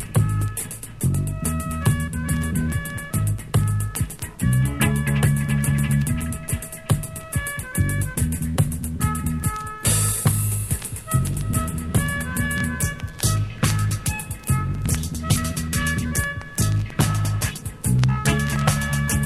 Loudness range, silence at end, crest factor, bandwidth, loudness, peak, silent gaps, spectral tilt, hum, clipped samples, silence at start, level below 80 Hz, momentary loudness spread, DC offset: 2 LU; 0 s; 20 dB; 15.5 kHz; -23 LUFS; -2 dBFS; none; -4.5 dB/octave; none; under 0.1%; 0 s; -32 dBFS; 6 LU; under 0.1%